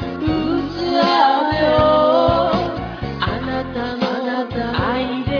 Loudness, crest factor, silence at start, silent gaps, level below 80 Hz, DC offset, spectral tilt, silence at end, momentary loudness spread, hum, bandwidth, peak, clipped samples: -18 LUFS; 14 dB; 0 s; none; -36 dBFS; under 0.1%; -7 dB/octave; 0 s; 9 LU; none; 5.4 kHz; -2 dBFS; under 0.1%